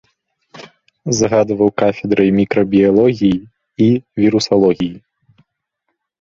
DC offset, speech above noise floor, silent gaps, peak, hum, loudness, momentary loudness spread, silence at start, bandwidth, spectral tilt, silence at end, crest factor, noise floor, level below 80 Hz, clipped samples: under 0.1%; 60 dB; none; 0 dBFS; none; -14 LUFS; 9 LU; 0.55 s; 7.6 kHz; -6 dB/octave; 1.35 s; 14 dB; -73 dBFS; -48 dBFS; under 0.1%